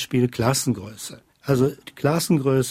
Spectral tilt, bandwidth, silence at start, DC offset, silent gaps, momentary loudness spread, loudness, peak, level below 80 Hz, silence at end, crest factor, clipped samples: -5.5 dB/octave; 16 kHz; 0 s; under 0.1%; none; 16 LU; -22 LUFS; -6 dBFS; -52 dBFS; 0 s; 16 dB; under 0.1%